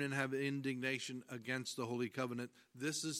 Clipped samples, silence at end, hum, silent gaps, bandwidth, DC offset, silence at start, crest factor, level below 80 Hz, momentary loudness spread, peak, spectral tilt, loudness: under 0.1%; 0 s; none; none; 16 kHz; under 0.1%; 0 s; 20 dB; -86 dBFS; 8 LU; -22 dBFS; -4 dB/octave; -41 LUFS